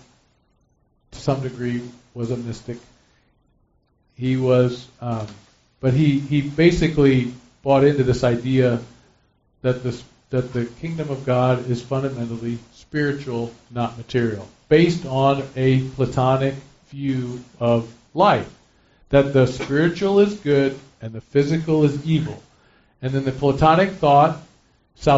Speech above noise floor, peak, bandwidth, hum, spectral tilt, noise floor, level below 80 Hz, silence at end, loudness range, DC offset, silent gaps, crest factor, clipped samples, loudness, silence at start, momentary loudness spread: 44 dB; -2 dBFS; 8 kHz; none; -6.5 dB/octave; -63 dBFS; -46 dBFS; 0 s; 6 LU; under 0.1%; none; 18 dB; under 0.1%; -20 LUFS; 1.15 s; 15 LU